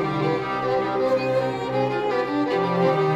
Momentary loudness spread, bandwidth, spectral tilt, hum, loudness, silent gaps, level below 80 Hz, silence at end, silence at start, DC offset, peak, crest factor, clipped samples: 3 LU; 11.5 kHz; -7.5 dB/octave; none; -23 LUFS; none; -56 dBFS; 0 s; 0 s; under 0.1%; -8 dBFS; 14 dB; under 0.1%